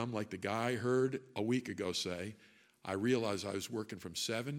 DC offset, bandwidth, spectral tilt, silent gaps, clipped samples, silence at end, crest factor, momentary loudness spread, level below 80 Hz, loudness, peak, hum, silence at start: under 0.1%; 16.5 kHz; -4.5 dB/octave; none; under 0.1%; 0 s; 18 dB; 9 LU; -74 dBFS; -37 LUFS; -20 dBFS; none; 0 s